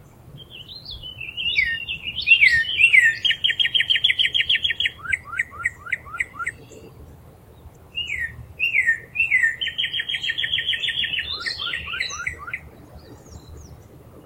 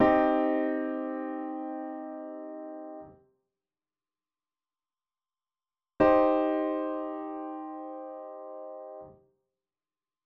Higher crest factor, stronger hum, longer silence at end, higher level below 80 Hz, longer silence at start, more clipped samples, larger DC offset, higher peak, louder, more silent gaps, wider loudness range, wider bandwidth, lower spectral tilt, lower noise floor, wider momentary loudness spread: about the same, 22 dB vs 22 dB; neither; second, 0.05 s vs 1.15 s; first, -50 dBFS vs -62 dBFS; first, 0.25 s vs 0 s; neither; neither; first, -2 dBFS vs -10 dBFS; first, -19 LUFS vs -29 LUFS; neither; second, 12 LU vs 16 LU; first, 16.5 kHz vs 5.6 kHz; second, -0.5 dB/octave vs -5 dB/octave; second, -46 dBFS vs under -90 dBFS; about the same, 19 LU vs 19 LU